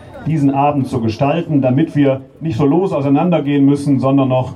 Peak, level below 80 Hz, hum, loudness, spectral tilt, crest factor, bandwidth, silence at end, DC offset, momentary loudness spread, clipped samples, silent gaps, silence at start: -2 dBFS; -50 dBFS; none; -15 LUFS; -8.5 dB/octave; 12 dB; 10 kHz; 0 s; under 0.1%; 4 LU; under 0.1%; none; 0 s